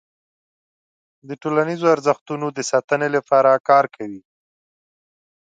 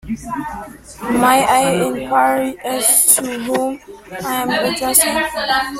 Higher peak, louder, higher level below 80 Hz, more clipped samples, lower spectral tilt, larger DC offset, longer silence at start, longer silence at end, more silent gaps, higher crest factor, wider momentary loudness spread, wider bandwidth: about the same, -2 dBFS vs 0 dBFS; second, -18 LUFS vs -15 LUFS; second, -72 dBFS vs -46 dBFS; neither; first, -5 dB/octave vs -2 dB/octave; neither; first, 1.3 s vs 0.05 s; first, 1.25 s vs 0 s; first, 2.21-2.26 s, 2.84-2.88 s, 3.60-3.64 s vs none; about the same, 20 dB vs 16 dB; second, 14 LU vs 17 LU; second, 9.2 kHz vs 16.5 kHz